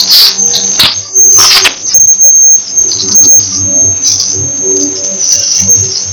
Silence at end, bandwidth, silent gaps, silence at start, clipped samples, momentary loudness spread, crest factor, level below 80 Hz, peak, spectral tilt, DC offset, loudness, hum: 0 s; over 20 kHz; none; 0 s; 0.9%; 7 LU; 6 dB; -44 dBFS; 0 dBFS; 0.5 dB/octave; under 0.1%; -3 LUFS; none